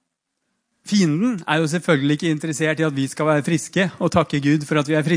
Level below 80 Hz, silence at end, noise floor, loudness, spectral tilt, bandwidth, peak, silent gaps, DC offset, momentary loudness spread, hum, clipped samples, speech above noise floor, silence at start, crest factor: -56 dBFS; 0 s; -76 dBFS; -20 LUFS; -5.5 dB/octave; 10.5 kHz; -2 dBFS; none; under 0.1%; 3 LU; none; under 0.1%; 57 dB; 0.85 s; 18 dB